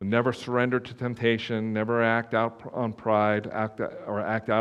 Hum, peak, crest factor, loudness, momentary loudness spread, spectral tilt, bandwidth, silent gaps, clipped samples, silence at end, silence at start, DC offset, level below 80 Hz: none; -6 dBFS; 20 dB; -27 LUFS; 8 LU; -7 dB/octave; 10.5 kHz; none; under 0.1%; 0 s; 0 s; under 0.1%; -66 dBFS